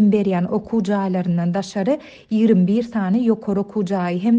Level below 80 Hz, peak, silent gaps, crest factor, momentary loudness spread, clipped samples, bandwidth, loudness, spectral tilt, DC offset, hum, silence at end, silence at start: -56 dBFS; -4 dBFS; none; 14 dB; 6 LU; under 0.1%; 8.2 kHz; -20 LUFS; -8 dB/octave; under 0.1%; none; 0 s; 0 s